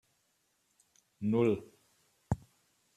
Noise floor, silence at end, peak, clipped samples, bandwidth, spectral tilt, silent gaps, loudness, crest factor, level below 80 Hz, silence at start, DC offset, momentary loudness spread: -76 dBFS; 0.6 s; -16 dBFS; under 0.1%; 13 kHz; -8.5 dB/octave; none; -34 LUFS; 22 dB; -60 dBFS; 1.2 s; under 0.1%; 9 LU